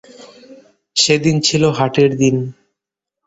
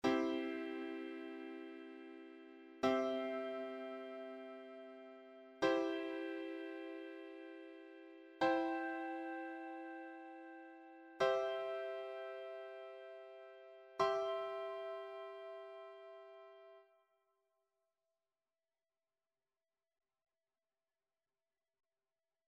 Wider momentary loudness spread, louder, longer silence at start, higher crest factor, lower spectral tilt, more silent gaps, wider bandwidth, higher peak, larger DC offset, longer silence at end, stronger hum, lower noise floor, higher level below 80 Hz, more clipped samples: second, 8 LU vs 20 LU; first, -14 LUFS vs -43 LUFS; first, 0.2 s vs 0.05 s; second, 16 dB vs 24 dB; about the same, -4.5 dB/octave vs -4.5 dB/octave; neither; second, 8.2 kHz vs 9.8 kHz; first, 0 dBFS vs -22 dBFS; neither; second, 0.75 s vs 5.65 s; neither; second, -83 dBFS vs under -90 dBFS; first, -52 dBFS vs -84 dBFS; neither